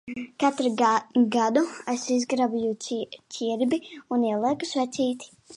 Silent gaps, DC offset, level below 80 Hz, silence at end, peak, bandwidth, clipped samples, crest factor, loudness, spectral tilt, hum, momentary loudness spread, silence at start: none; under 0.1%; -72 dBFS; 0 s; -8 dBFS; 11 kHz; under 0.1%; 18 dB; -25 LUFS; -4 dB/octave; none; 10 LU; 0.05 s